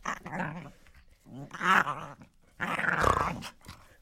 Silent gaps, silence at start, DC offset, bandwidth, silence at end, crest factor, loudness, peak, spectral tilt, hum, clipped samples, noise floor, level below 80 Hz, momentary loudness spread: none; 0 s; under 0.1%; 16.5 kHz; 0.25 s; 26 dB; -29 LUFS; -8 dBFS; -4.5 dB/octave; none; under 0.1%; -57 dBFS; -50 dBFS; 25 LU